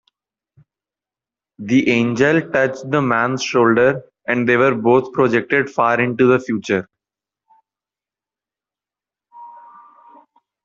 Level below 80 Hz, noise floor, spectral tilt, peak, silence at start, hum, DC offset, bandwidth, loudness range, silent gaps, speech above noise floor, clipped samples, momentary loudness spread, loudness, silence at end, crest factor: -60 dBFS; -90 dBFS; -6 dB/octave; -2 dBFS; 1.6 s; none; under 0.1%; 7.6 kHz; 6 LU; none; 74 dB; under 0.1%; 6 LU; -16 LUFS; 1.05 s; 18 dB